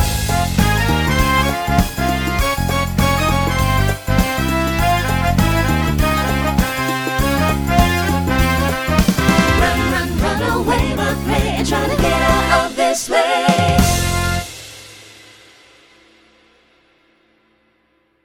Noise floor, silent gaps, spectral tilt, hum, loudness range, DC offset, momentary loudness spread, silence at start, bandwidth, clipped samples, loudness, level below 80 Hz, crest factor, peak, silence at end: -61 dBFS; none; -5 dB/octave; none; 3 LU; under 0.1%; 4 LU; 0 s; over 20 kHz; under 0.1%; -16 LUFS; -24 dBFS; 16 dB; 0 dBFS; 3.2 s